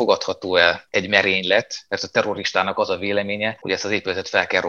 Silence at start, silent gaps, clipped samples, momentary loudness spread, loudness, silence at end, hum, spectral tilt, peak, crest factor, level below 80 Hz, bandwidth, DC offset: 0 s; none; under 0.1%; 7 LU; -20 LUFS; 0 s; none; -3.5 dB/octave; 0 dBFS; 20 dB; -64 dBFS; 7.6 kHz; under 0.1%